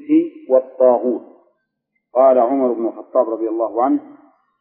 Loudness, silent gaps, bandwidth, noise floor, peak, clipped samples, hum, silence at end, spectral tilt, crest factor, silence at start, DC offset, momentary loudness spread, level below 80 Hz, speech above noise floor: -17 LUFS; none; 3.3 kHz; -73 dBFS; -2 dBFS; under 0.1%; none; 0.5 s; -11 dB/octave; 16 dB; 0 s; under 0.1%; 10 LU; -76 dBFS; 57 dB